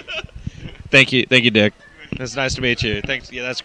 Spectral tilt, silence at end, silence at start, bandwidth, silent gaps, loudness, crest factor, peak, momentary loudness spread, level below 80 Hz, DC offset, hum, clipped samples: -4 dB/octave; 0 s; 0.05 s; 10 kHz; none; -16 LUFS; 20 dB; 0 dBFS; 21 LU; -40 dBFS; under 0.1%; none; under 0.1%